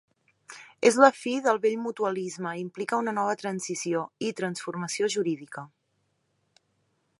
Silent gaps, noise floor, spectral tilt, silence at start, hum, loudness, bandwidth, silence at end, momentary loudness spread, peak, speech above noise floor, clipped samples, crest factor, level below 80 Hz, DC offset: none; -74 dBFS; -4 dB/octave; 0.5 s; none; -27 LUFS; 11.5 kHz; 1.55 s; 15 LU; -2 dBFS; 48 dB; under 0.1%; 26 dB; -80 dBFS; under 0.1%